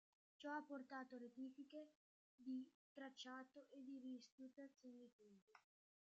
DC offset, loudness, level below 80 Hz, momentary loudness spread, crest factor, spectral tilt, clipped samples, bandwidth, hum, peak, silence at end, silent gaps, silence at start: under 0.1%; -58 LUFS; under -90 dBFS; 11 LU; 18 dB; -1.5 dB/octave; under 0.1%; 8 kHz; none; -40 dBFS; 0.45 s; 1.95-2.38 s, 2.74-2.96 s, 4.32-4.38 s, 5.12-5.19 s, 5.42-5.47 s; 0.4 s